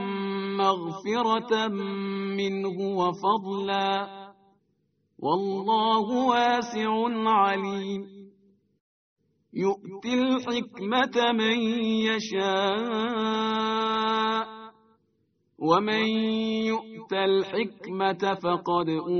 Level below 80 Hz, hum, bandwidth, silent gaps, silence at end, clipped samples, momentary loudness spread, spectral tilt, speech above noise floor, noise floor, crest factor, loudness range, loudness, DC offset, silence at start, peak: -70 dBFS; none; 6.6 kHz; 8.80-9.16 s; 0 s; under 0.1%; 8 LU; -3 dB/octave; 46 dB; -72 dBFS; 18 dB; 4 LU; -26 LUFS; under 0.1%; 0 s; -8 dBFS